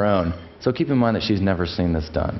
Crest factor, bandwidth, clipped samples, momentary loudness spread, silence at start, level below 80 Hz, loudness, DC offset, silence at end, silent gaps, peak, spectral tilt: 16 dB; 6 kHz; under 0.1%; 6 LU; 0 s; -38 dBFS; -22 LUFS; under 0.1%; 0 s; none; -6 dBFS; -8 dB/octave